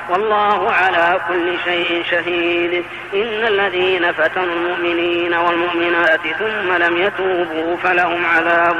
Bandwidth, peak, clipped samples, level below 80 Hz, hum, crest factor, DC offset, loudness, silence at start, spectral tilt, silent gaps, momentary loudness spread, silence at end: 9 kHz; -6 dBFS; under 0.1%; -54 dBFS; none; 10 dB; 0.1%; -16 LUFS; 0 s; -5 dB/octave; none; 5 LU; 0 s